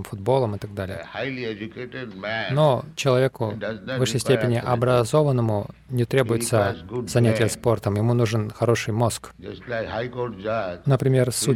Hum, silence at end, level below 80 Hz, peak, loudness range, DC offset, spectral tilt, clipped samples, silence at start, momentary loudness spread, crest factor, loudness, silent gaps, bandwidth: none; 0 s; -52 dBFS; -6 dBFS; 3 LU; under 0.1%; -5.5 dB/octave; under 0.1%; 0 s; 11 LU; 18 dB; -23 LUFS; none; 15.5 kHz